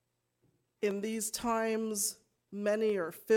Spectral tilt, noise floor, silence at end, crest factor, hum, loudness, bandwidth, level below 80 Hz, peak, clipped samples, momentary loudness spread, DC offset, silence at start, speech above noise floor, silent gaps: -3.5 dB/octave; -76 dBFS; 0 s; 18 dB; none; -34 LUFS; 18 kHz; -70 dBFS; -16 dBFS; under 0.1%; 5 LU; under 0.1%; 0.8 s; 44 dB; none